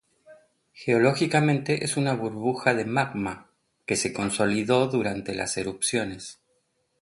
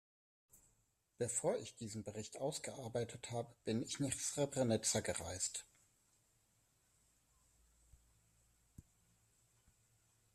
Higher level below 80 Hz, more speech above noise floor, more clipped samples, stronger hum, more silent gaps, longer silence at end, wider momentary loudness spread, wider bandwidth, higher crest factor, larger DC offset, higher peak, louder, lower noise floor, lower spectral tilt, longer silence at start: first, -60 dBFS vs -74 dBFS; first, 47 dB vs 38 dB; neither; neither; neither; second, 0.7 s vs 1.55 s; about the same, 12 LU vs 11 LU; second, 11.5 kHz vs 14 kHz; about the same, 20 dB vs 22 dB; neither; first, -6 dBFS vs -22 dBFS; first, -25 LUFS vs -41 LUFS; second, -72 dBFS vs -79 dBFS; about the same, -4.5 dB/octave vs -4 dB/octave; second, 0.3 s vs 0.55 s